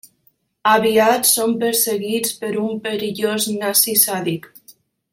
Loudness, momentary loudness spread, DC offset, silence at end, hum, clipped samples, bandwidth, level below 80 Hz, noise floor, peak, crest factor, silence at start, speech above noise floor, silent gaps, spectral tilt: -17 LUFS; 10 LU; under 0.1%; 0.4 s; none; under 0.1%; 16.5 kHz; -64 dBFS; -61 dBFS; 0 dBFS; 20 dB; 0.65 s; 43 dB; none; -2.5 dB/octave